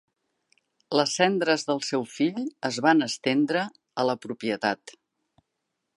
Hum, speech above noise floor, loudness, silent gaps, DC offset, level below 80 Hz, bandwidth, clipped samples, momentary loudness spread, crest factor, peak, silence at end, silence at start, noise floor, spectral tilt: none; 56 dB; -26 LUFS; none; under 0.1%; -78 dBFS; 11.5 kHz; under 0.1%; 9 LU; 22 dB; -6 dBFS; 1.05 s; 0.9 s; -81 dBFS; -4 dB/octave